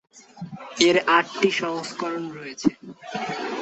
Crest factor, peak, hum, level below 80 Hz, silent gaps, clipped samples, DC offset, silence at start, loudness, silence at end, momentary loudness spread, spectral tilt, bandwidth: 22 dB; -2 dBFS; none; -68 dBFS; none; under 0.1%; under 0.1%; 0.15 s; -23 LUFS; 0 s; 19 LU; -3.5 dB/octave; 8.4 kHz